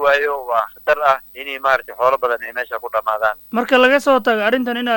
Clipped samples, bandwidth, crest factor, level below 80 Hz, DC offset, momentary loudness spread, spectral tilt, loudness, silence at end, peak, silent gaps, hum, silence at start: under 0.1%; 17.5 kHz; 16 dB; -54 dBFS; under 0.1%; 10 LU; -3.5 dB/octave; -17 LUFS; 0 s; 0 dBFS; none; none; 0 s